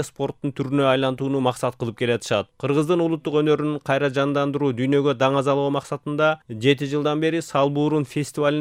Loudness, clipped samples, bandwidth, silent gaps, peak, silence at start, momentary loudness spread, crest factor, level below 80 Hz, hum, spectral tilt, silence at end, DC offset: -22 LUFS; under 0.1%; 15.5 kHz; none; -4 dBFS; 0 s; 6 LU; 16 dB; -62 dBFS; none; -6 dB/octave; 0 s; under 0.1%